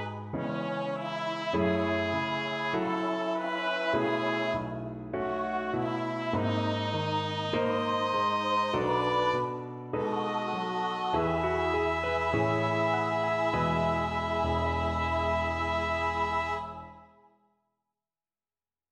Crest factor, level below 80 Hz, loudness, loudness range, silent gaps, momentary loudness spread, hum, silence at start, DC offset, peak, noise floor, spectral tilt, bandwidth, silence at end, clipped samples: 14 dB; -50 dBFS; -30 LUFS; 3 LU; none; 6 LU; none; 0 s; under 0.1%; -16 dBFS; under -90 dBFS; -6 dB/octave; 11 kHz; 1.85 s; under 0.1%